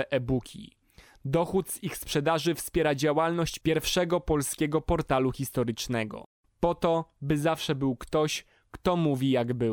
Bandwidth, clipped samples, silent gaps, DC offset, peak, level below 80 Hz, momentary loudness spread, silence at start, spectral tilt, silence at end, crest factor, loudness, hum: 19 kHz; under 0.1%; 6.26-6.44 s; under 0.1%; -12 dBFS; -48 dBFS; 6 LU; 0 s; -5 dB/octave; 0 s; 16 dB; -28 LUFS; none